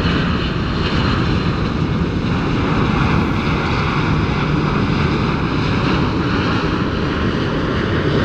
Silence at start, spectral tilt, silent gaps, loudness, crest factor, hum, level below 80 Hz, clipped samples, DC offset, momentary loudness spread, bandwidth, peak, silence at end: 0 s; -7 dB/octave; none; -18 LUFS; 14 dB; none; -28 dBFS; under 0.1%; under 0.1%; 2 LU; 8.4 kHz; -4 dBFS; 0 s